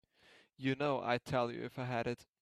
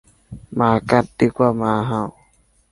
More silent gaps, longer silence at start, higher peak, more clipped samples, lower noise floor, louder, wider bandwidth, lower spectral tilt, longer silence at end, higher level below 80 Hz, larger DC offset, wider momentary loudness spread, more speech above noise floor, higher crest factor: neither; first, 0.6 s vs 0.3 s; second, -18 dBFS vs -2 dBFS; neither; first, -67 dBFS vs -58 dBFS; second, -37 LUFS vs -19 LUFS; first, 13.5 kHz vs 11.5 kHz; about the same, -6.5 dB/octave vs -7.5 dB/octave; second, 0.2 s vs 0.6 s; second, -70 dBFS vs -48 dBFS; neither; second, 6 LU vs 10 LU; second, 29 dB vs 40 dB; about the same, 20 dB vs 18 dB